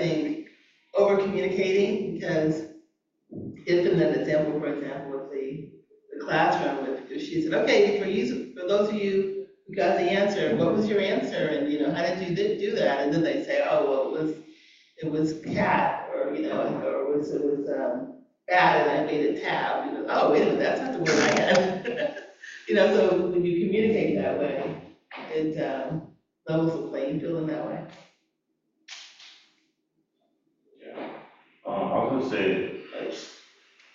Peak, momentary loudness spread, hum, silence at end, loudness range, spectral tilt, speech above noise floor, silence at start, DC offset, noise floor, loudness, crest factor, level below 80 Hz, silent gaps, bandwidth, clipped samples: -8 dBFS; 18 LU; none; 0.6 s; 8 LU; -5.5 dB/octave; 52 dB; 0 s; under 0.1%; -77 dBFS; -26 LUFS; 18 dB; -66 dBFS; none; 7.6 kHz; under 0.1%